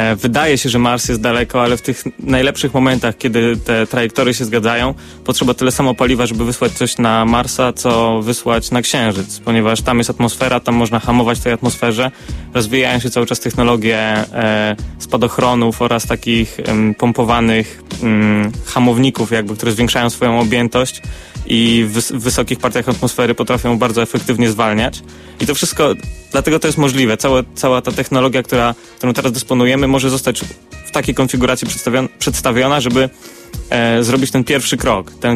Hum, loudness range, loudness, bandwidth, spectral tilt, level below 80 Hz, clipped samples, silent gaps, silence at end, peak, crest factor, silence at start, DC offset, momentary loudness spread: none; 1 LU; -14 LUFS; 15.5 kHz; -4.5 dB/octave; -34 dBFS; under 0.1%; none; 0 s; 0 dBFS; 14 dB; 0 s; under 0.1%; 6 LU